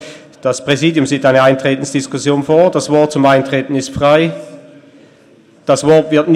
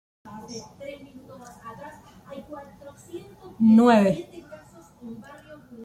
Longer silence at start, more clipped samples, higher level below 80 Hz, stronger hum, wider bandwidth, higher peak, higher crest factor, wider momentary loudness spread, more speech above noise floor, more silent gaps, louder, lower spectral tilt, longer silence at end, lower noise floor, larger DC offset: second, 0 s vs 0.3 s; neither; first, -50 dBFS vs -62 dBFS; neither; first, 12.5 kHz vs 11 kHz; first, 0 dBFS vs -6 dBFS; second, 12 dB vs 20 dB; second, 9 LU vs 28 LU; first, 34 dB vs 30 dB; neither; first, -12 LUFS vs -19 LUFS; second, -5.5 dB/octave vs -7 dB/octave; about the same, 0 s vs 0 s; about the same, -45 dBFS vs -48 dBFS; neither